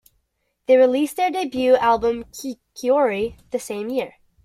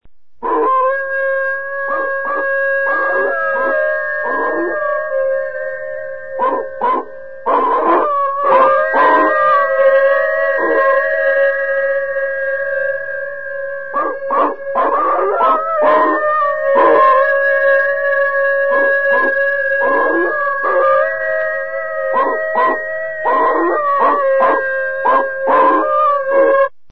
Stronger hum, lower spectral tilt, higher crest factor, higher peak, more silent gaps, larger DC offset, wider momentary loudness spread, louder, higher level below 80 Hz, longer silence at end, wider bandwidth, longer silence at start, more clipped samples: neither; second, -4.5 dB/octave vs -6 dB/octave; about the same, 16 dB vs 14 dB; second, -4 dBFS vs 0 dBFS; neither; second, under 0.1% vs 2%; first, 16 LU vs 8 LU; second, -20 LUFS vs -14 LUFS; about the same, -54 dBFS vs -56 dBFS; about the same, 0.35 s vs 0.25 s; first, 15 kHz vs 5 kHz; first, 0.7 s vs 0 s; neither